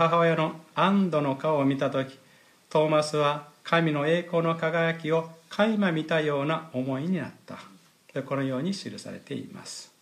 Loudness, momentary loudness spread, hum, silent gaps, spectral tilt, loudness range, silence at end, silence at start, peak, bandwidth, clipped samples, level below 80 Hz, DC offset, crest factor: -26 LUFS; 14 LU; none; none; -6 dB/octave; 6 LU; 0.15 s; 0 s; -10 dBFS; 14 kHz; under 0.1%; -78 dBFS; under 0.1%; 18 dB